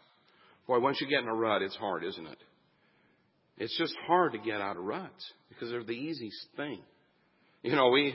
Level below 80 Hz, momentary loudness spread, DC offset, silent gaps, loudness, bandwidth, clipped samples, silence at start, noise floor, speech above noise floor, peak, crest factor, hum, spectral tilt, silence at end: -76 dBFS; 17 LU; under 0.1%; none; -32 LUFS; 5.8 kHz; under 0.1%; 0.7 s; -70 dBFS; 39 dB; -12 dBFS; 22 dB; none; -8.5 dB/octave; 0 s